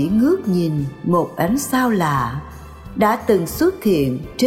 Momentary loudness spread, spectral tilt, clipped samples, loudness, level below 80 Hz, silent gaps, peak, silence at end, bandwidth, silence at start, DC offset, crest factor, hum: 9 LU; -6 dB/octave; under 0.1%; -18 LUFS; -42 dBFS; none; -4 dBFS; 0 s; 17 kHz; 0 s; 0.2%; 14 dB; none